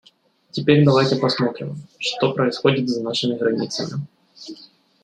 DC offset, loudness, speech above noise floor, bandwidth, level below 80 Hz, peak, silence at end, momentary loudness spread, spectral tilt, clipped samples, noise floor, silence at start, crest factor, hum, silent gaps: under 0.1%; -20 LUFS; 37 dB; 9.4 kHz; -62 dBFS; -2 dBFS; 0.4 s; 21 LU; -6 dB/octave; under 0.1%; -57 dBFS; 0.55 s; 18 dB; none; none